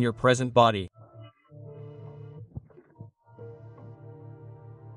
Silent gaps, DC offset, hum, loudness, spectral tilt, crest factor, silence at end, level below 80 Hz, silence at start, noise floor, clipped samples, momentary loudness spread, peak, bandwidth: none; under 0.1%; none; -23 LUFS; -5.5 dB/octave; 24 dB; 0 s; -60 dBFS; 0 s; -50 dBFS; under 0.1%; 27 LU; -6 dBFS; 11.5 kHz